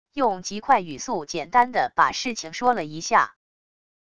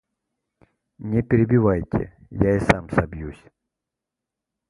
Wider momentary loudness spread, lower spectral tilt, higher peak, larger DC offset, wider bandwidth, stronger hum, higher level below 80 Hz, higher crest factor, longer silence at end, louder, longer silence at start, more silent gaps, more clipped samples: second, 8 LU vs 16 LU; second, -3 dB/octave vs -8.5 dB/octave; second, -4 dBFS vs 0 dBFS; first, 0.4% vs under 0.1%; about the same, 10.5 kHz vs 11.5 kHz; neither; second, -58 dBFS vs -40 dBFS; about the same, 20 dB vs 24 dB; second, 0.75 s vs 1.35 s; about the same, -23 LUFS vs -21 LUFS; second, 0.15 s vs 1 s; neither; neither